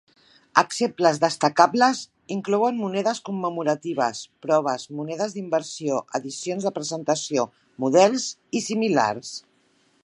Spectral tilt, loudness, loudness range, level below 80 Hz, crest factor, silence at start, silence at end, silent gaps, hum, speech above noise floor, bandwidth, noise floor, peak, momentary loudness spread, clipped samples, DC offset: -4 dB/octave; -23 LUFS; 4 LU; -74 dBFS; 24 dB; 0.55 s; 0.65 s; none; none; 40 dB; 11.5 kHz; -63 dBFS; 0 dBFS; 12 LU; under 0.1%; under 0.1%